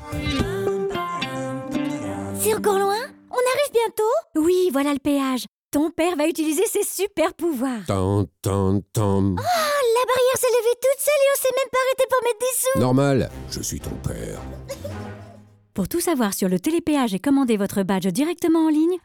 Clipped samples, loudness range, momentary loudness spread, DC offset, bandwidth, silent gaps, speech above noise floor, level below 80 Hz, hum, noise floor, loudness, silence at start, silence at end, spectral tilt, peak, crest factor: under 0.1%; 5 LU; 10 LU; under 0.1%; 19 kHz; 5.48-5.71 s; 26 dB; -46 dBFS; none; -47 dBFS; -22 LUFS; 0 s; 0.05 s; -5 dB/octave; -10 dBFS; 12 dB